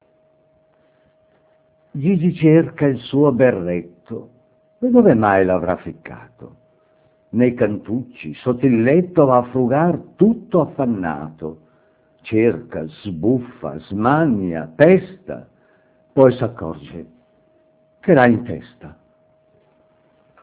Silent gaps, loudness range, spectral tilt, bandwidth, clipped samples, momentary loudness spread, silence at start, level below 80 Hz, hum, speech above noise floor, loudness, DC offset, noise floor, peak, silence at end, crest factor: none; 4 LU; -12 dB/octave; 4 kHz; under 0.1%; 20 LU; 1.95 s; -50 dBFS; none; 41 dB; -17 LUFS; under 0.1%; -58 dBFS; 0 dBFS; 1.5 s; 18 dB